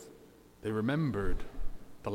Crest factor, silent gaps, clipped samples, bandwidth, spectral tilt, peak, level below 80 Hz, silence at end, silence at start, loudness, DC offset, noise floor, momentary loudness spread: 14 dB; none; under 0.1%; 10.5 kHz; -7.5 dB/octave; -20 dBFS; -42 dBFS; 0 s; 0 s; -35 LUFS; under 0.1%; -57 dBFS; 18 LU